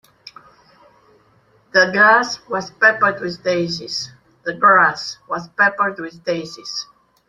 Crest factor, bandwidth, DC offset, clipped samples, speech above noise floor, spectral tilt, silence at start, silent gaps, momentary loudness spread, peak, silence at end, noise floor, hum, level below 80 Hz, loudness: 18 dB; 12.5 kHz; under 0.1%; under 0.1%; 38 dB; -3.5 dB/octave; 1.75 s; none; 16 LU; 0 dBFS; 0.45 s; -56 dBFS; none; -62 dBFS; -17 LUFS